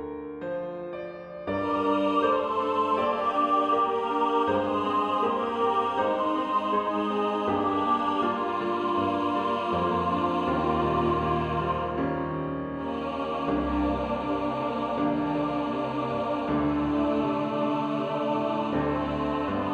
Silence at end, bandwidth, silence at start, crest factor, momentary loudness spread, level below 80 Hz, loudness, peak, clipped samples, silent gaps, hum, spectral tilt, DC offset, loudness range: 0 s; 8.2 kHz; 0 s; 14 dB; 6 LU; -48 dBFS; -27 LUFS; -12 dBFS; under 0.1%; none; none; -7.5 dB/octave; under 0.1%; 3 LU